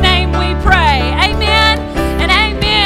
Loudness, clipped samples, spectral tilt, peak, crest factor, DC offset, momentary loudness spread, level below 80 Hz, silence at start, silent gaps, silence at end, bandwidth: -11 LUFS; 0.2%; -5 dB/octave; 0 dBFS; 12 dB; under 0.1%; 5 LU; -18 dBFS; 0 s; none; 0 s; 14.5 kHz